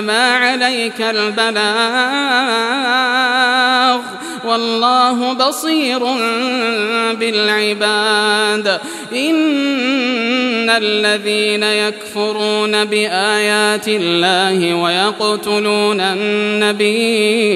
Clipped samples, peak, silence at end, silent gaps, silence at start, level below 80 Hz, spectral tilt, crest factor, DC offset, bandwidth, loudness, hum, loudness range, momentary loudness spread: under 0.1%; 0 dBFS; 0 s; none; 0 s; -70 dBFS; -3 dB/octave; 14 dB; under 0.1%; 14.5 kHz; -14 LUFS; none; 1 LU; 4 LU